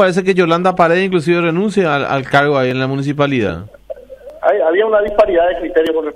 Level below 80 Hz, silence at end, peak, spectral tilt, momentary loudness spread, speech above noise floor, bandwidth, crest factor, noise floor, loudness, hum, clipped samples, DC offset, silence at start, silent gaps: -42 dBFS; 0 s; 0 dBFS; -6.5 dB/octave; 7 LU; 22 dB; 11.5 kHz; 14 dB; -35 dBFS; -14 LUFS; none; under 0.1%; under 0.1%; 0 s; none